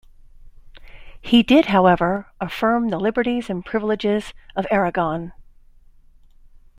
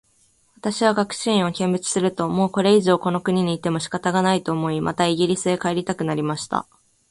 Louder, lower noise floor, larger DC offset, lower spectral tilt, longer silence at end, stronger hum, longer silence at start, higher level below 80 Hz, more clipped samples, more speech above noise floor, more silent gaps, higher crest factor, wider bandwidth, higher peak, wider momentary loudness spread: about the same, -20 LUFS vs -21 LUFS; second, -49 dBFS vs -61 dBFS; neither; first, -6.5 dB/octave vs -5 dB/octave; first, 1.35 s vs 0.5 s; neither; second, 0.4 s vs 0.65 s; first, -46 dBFS vs -58 dBFS; neither; second, 30 dB vs 40 dB; neither; about the same, 18 dB vs 18 dB; first, 15 kHz vs 11.5 kHz; about the same, -2 dBFS vs -4 dBFS; first, 15 LU vs 7 LU